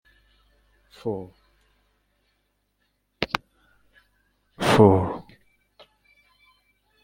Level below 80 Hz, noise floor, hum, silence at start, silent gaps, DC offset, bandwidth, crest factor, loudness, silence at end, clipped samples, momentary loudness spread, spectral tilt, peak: -58 dBFS; -72 dBFS; 50 Hz at -50 dBFS; 1.05 s; none; under 0.1%; 16.5 kHz; 26 dB; -22 LUFS; 1.8 s; under 0.1%; 19 LU; -6.5 dB/octave; -2 dBFS